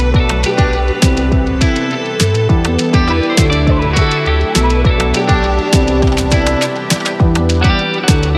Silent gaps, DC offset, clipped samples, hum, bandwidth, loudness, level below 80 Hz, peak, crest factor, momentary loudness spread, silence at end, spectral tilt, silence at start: none; under 0.1%; under 0.1%; none; 14 kHz; -13 LUFS; -18 dBFS; 0 dBFS; 12 dB; 2 LU; 0 s; -5.5 dB/octave; 0 s